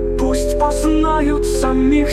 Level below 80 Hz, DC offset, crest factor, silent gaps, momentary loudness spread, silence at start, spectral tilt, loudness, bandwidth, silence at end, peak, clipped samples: -22 dBFS; under 0.1%; 12 dB; none; 3 LU; 0 s; -5.5 dB/octave; -16 LUFS; 14.5 kHz; 0 s; -4 dBFS; under 0.1%